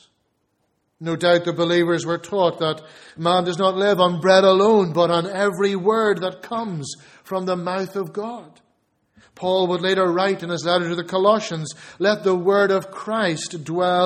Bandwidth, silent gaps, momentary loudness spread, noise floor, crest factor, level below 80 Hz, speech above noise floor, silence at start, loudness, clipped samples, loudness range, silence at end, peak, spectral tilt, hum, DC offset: 14.5 kHz; none; 12 LU; -70 dBFS; 20 dB; -64 dBFS; 50 dB; 1 s; -20 LUFS; under 0.1%; 7 LU; 0 s; 0 dBFS; -5 dB/octave; none; under 0.1%